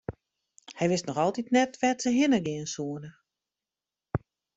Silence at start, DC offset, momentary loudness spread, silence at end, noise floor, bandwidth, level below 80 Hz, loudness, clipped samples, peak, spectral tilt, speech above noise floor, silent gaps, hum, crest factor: 0.1 s; under 0.1%; 16 LU; 0.4 s; under -90 dBFS; 8.2 kHz; -60 dBFS; -28 LUFS; under 0.1%; -10 dBFS; -5 dB/octave; over 63 dB; none; none; 18 dB